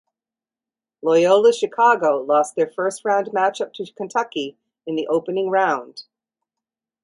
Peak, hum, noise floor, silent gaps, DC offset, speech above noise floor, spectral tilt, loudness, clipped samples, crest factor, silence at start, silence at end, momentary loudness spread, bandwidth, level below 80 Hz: -4 dBFS; none; under -90 dBFS; none; under 0.1%; over 71 dB; -4 dB/octave; -20 LUFS; under 0.1%; 16 dB; 1.05 s; 1 s; 14 LU; 11.5 kHz; -74 dBFS